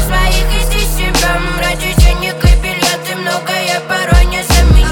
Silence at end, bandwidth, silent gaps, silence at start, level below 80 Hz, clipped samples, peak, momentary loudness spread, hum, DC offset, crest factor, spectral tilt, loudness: 0 s; 19 kHz; none; 0 s; -12 dBFS; under 0.1%; 0 dBFS; 4 LU; none; under 0.1%; 10 dB; -4 dB/octave; -13 LUFS